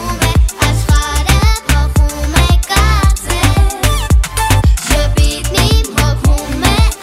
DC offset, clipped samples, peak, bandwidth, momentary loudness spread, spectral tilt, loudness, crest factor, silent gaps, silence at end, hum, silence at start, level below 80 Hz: under 0.1%; under 0.1%; 0 dBFS; 16.5 kHz; 2 LU; -4.5 dB/octave; -12 LUFS; 10 dB; none; 0 s; none; 0 s; -14 dBFS